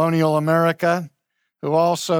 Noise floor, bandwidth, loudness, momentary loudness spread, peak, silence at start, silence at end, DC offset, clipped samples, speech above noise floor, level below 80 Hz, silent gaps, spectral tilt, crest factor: -74 dBFS; 17 kHz; -19 LUFS; 10 LU; -6 dBFS; 0 s; 0 s; under 0.1%; under 0.1%; 56 dB; -70 dBFS; none; -6 dB/octave; 14 dB